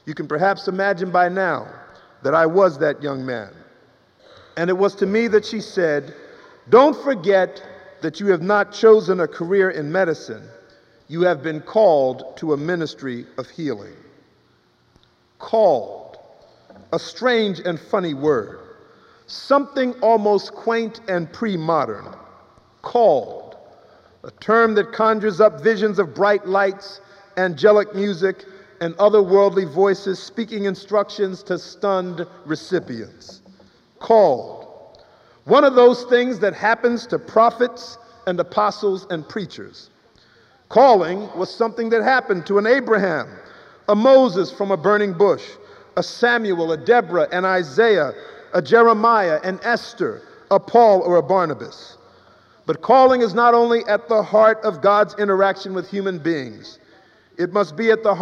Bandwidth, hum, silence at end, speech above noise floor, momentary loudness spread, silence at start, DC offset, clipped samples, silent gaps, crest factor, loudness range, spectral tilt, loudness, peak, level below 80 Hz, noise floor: 7.6 kHz; none; 0 s; 41 dB; 16 LU; 0.05 s; under 0.1%; under 0.1%; none; 18 dB; 6 LU; -6 dB/octave; -18 LUFS; 0 dBFS; -66 dBFS; -59 dBFS